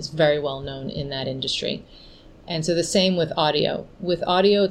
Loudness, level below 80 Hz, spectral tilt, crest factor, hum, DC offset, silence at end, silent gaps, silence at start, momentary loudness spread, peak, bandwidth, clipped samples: -23 LUFS; -50 dBFS; -4.5 dB/octave; 18 dB; none; under 0.1%; 0 s; none; 0 s; 11 LU; -6 dBFS; 12.5 kHz; under 0.1%